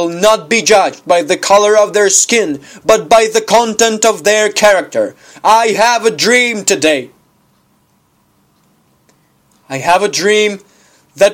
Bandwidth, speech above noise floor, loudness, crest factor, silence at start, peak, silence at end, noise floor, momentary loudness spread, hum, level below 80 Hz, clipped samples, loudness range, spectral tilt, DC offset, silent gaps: over 20 kHz; 45 dB; -10 LUFS; 12 dB; 0 s; 0 dBFS; 0 s; -55 dBFS; 9 LU; none; -54 dBFS; 0.2%; 9 LU; -2 dB/octave; under 0.1%; none